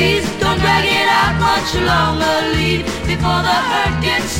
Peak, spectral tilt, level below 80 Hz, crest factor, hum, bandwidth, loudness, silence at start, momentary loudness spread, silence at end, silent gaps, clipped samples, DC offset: 0 dBFS; -4.5 dB/octave; -30 dBFS; 14 dB; none; 16 kHz; -15 LUFS; 0 s; 5 LU; 0 s; none; under 0.1%; under 0.1%